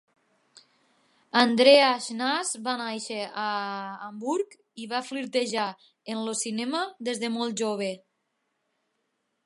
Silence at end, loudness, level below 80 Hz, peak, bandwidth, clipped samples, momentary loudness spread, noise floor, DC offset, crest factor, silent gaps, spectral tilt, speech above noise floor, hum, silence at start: 1.5 s; -26 LUFS; -84 dBFS; -4 dBFS; 11.5 kHz; under 0.1%; 16 LU; -77 dBFS; under 0.1%; 24 dB; none; -2.5 dB/octave; 51 dB; none; 1.35 s